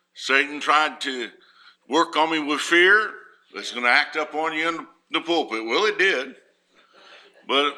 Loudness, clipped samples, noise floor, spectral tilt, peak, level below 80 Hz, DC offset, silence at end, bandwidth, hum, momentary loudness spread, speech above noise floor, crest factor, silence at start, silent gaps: -21 LUFS; under 0.1%; -60 dBFS; -2 dB/octave; -4 dBFS; -84 dBFS; under 0.1%; 0 s; 13.5 kHz; none; 15 LU; 38 dB; 20 dB; 0.15 s; none